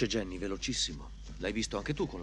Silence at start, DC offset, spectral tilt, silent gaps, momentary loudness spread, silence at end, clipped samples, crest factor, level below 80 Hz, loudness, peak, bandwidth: 0 s; under 0.1%; -3.5 dB/octave; none; 8 LU; 0 s; under 0.1%; 18 dB; -46 dBFS; -35 LUFS; -16 dBFS; 11.5 kHz